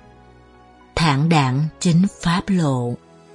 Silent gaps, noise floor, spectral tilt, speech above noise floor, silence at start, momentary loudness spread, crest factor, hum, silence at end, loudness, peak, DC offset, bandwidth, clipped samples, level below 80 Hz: none; -48 dBFS; -6 dB/octave; 30 dB; 0.95 s; 10 LU; 16 dB; none; 0.4 s; -19 LUFS; -2 dBFS; under 0.1%; 11.5 kHz; under 0.1%; -42 dBFS